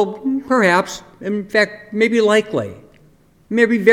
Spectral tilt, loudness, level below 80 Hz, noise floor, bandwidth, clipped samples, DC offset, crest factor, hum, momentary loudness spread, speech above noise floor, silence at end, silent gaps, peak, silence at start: -5 dB/octave; -17 LUFS; -56 dBFS; -51 dBFS; 15.5 kHz; under 0.1%; under 0.1%; 18 dB; none; 11 LU; 35 dB; 0 s; none; 0 dBFS; 0 s